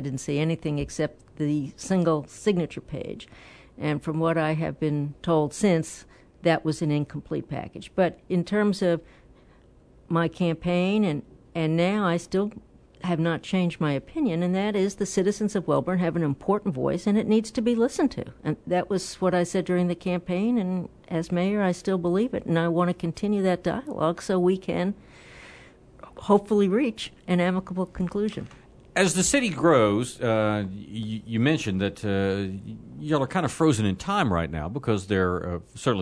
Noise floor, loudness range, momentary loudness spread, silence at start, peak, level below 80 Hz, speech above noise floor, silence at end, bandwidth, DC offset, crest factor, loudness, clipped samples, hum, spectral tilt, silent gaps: -54 dBFS; 3 LU; 10 LU; 0 s; -2 dBFS; -52 dBFS; 29 dB; 0 s; 11 kHz; under 0.1%; 22 dB; -26 LUFS; under 0.1%; none; -6 dB/octave; none